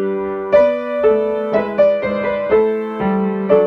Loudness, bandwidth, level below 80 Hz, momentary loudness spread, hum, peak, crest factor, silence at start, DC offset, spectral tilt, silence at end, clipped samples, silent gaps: -16 LUFS; 5.8 kHz; -48 dBFS; 6 LU; none; 0 dBFS; 16 dB; 0 s; under 0.1%; -9 dB/octave; 0 s; under 0.1%; none